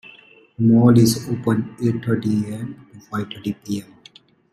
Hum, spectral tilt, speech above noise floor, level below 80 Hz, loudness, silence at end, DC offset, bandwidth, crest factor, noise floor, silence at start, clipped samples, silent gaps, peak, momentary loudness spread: none; -6.5 dB/octave; 31 dB; -54 dBFS; -20 LUFS; 0.7 s; under 0.1%; 13.5 kHz; 18 dB; -50 dBFS; 0.6 s; under 0.1%; none; -2 dBFS; 16 LU